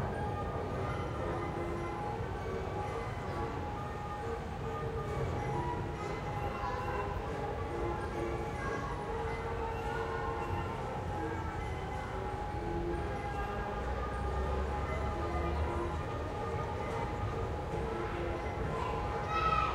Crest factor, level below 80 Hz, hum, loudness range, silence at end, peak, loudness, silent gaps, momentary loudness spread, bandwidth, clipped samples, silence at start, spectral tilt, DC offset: 18 dB; -44 dBFS; none; 2 LU; 0 s; -18 dBFS; -37 LUFS; none; 3 LU; 14.5 kHz; under 0.1%; 0 s; -7 dB/octave; under 0.1%